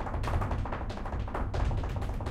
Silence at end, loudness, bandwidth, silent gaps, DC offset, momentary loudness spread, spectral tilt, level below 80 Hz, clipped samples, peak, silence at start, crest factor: 0 s; -34 LUFS; 12 kHz; none; under 0.1%; 4 LU; -7 dB/octave; -34 dBFS; under 0.1%; -18 dBFS; 0 s; 14 dB